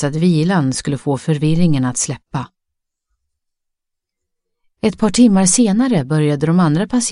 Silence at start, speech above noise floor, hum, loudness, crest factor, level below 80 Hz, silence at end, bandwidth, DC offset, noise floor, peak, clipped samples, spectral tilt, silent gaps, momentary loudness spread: 0 s; 64 dB; none; -15 LUFS; 16 dB; -44 dBFS; 0 s; 11.5 kHz; under 0.1%; -78 dBFS; -2 dBFS; under 0.1%; -5.5 dB/octave; none; 9 LU